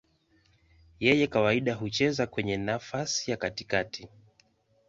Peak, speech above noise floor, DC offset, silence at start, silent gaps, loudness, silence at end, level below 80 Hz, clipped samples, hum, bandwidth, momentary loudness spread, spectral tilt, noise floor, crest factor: -8 dBFS; 38 dB; under 0.1%; 1 s; none; -28 LUFS; 0.8 s; -58 dBFS; under 0.1%; none; 7.8 kHz; 8 LU; -4.5 dB/octave; -67 dBFS; 22 dB